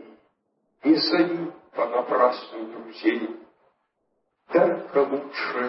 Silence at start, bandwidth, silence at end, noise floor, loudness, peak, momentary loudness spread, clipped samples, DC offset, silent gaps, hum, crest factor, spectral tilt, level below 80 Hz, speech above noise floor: 0 s; 5.8 kHz; 0 s; -74 dBFS; -24 LUFS; -6 dBFS; 15 LU; under 0.1%; under 0.1%; none; none; 20 dB; -9 dB/octave; -84 dBFS; 51 dB